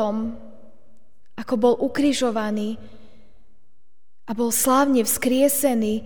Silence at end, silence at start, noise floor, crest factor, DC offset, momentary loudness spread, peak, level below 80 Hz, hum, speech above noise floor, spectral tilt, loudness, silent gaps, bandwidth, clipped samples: 0 s; 0 s; -73 dBFS; 16 dB; 2%; 16 LU; -6 dBFS; -54 dBFS; none; 52 dB; -3.5 dB/octave; -21 LUFS; none; over 20 kHz; under 0.1%